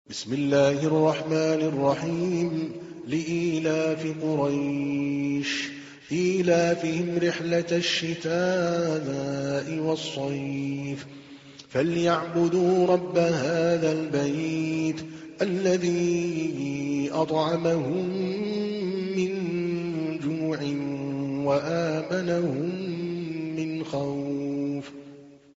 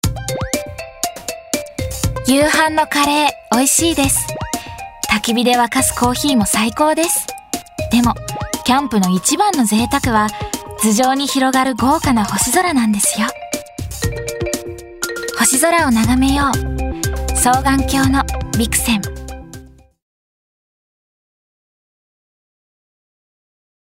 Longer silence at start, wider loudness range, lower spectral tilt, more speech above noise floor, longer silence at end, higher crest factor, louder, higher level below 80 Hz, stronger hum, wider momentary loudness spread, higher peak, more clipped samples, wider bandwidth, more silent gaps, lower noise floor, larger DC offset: about the same, 0.1 s vs 0.05 s; about the same, 4 LU vs 3 LU; first, -5.5 dB/octave vs -3.5 dB/octave; about the same, 23 dB vs 24 dB; second, 0.25 s vs 4.25 s; about the same, 16 dB vs 16 dB; second, -26 LUFS vs -16 LUFS; second, -64 dBFS vs -32 dBFS; neither; second, 8 LU vs 12 LU; second, -10 dBFS vs 0 dBFS; neither; second, 8 kHz vs 16.5 kHz; neither; first, -48 dBFS vs -38 dBFS; neither